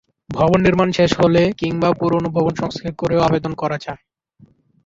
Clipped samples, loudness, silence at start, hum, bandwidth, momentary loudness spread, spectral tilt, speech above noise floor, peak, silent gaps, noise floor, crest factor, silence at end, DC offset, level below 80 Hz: under 0.1%; -17 LUFS; 0.3 s; none; 7.8 kHz; 11 LU; -7 dB/octave; 35 dB; -2 dBFS; none; -52 dBFS; 16 dB; 0.9 s; under 0.1%; -44 dBFS